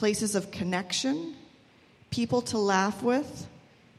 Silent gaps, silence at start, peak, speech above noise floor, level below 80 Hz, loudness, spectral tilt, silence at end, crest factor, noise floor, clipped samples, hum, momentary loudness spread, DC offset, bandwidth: none; 0 s; -10 dBFS; 30 dB; -62 dBFS; -28 LUFS; -4 dB/octave; 0.4 s; 20 dB; -59 dBFS; under 0.1%; none; 16 LU; under 0.1%; 14.5 kHz